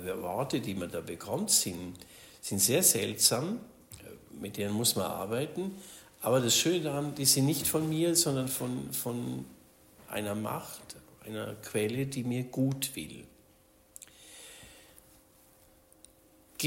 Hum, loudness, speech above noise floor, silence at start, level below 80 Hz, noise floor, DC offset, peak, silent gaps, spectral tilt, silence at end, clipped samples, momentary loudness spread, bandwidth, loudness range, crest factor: none; -30 LUFS; 32 dB; 0 s; -66 dBFS; -63 dBFS; under 0.1%; -8 dBFS; none; -3.5 dB/octave; 0 s; under 0.1%; 24 LU; 16.5 kHz; 9 LU; 24 dB